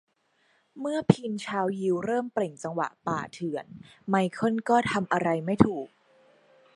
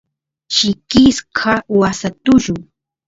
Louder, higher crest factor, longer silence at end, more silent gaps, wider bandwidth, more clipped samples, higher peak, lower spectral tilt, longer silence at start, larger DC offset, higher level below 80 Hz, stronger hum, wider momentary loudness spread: second, -28 LUFS vs -14 LUFS; first, 28 dB vs 16 dB; first, 0.9 s vs 0.45 s; neither; first, 11.5 kHz vs 7.8 kHz; neither; about the same, -2 dBFS vs 0 dBFS; first, -6.5 dB/octave vs -4.5 dB/octave; first, 0.75 s vs 0.5 s; neither; second, -60 dBFS vs -40 dBFS; neither; first, 12 LU vs 8 LU